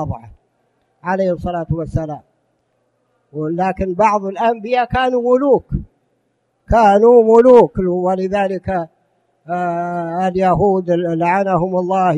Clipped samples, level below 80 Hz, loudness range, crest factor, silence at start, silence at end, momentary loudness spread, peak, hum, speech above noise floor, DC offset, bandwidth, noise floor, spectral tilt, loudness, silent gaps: under 0.1%; -38 dBFS; 9 LU; 16 dB; 0 s; 0 s; 16 LU; 0 dBFS; none; 51 dB; under 0.1%; 8.2 kHz; -65 dBFS; -8 dB/octave; -15 LUFS; none